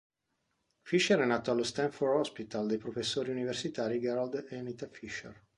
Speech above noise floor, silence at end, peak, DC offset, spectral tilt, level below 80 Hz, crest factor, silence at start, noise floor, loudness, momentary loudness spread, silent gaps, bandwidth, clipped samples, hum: 48 dB; 0.25 s; -14 dBFS; under 0.1%; -4.5 dB/octave; -70 dBFS; 20 dB; 0.85 s; -81 dBFS; -33 LUFS; 14 LU; none; 11.5 kHz; under 0.1%; none